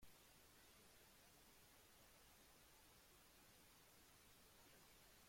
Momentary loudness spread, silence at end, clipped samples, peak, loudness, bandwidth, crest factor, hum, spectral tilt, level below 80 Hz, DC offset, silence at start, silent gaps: 1 LU; 0 s; under 0.1%; -54 dBFS; -69 LUFS; 16.5 kHz; 16 dB; none; -2 dB/octave; -80 dBFS; under 0.1%; 0 s; none